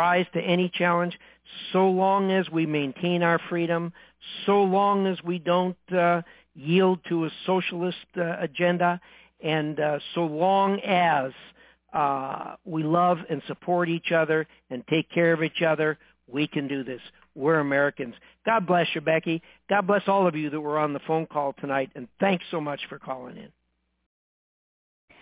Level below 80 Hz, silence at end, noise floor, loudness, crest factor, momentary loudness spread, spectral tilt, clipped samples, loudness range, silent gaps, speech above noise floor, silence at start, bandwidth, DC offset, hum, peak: -70 dBFS; 1.75 s; under -90 dBFS; -25 LUFS; 18 dB; 13 LU; -10 dB/octave; under 0.1%; 3 LU; none; over 65 dB; 0 s; 4 kHz; under 0.1%; none; -8 dBFS